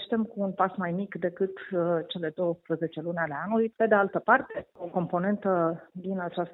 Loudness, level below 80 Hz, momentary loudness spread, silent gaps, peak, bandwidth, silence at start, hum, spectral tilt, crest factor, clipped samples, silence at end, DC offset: -29 LUFS; -70 dBFS; 9 LU; none; -6 dBFS; 4.1 kHz; 0 s; none; -10 dB/octave; 22 dB; under 0.1%; 0 s; under 0.1%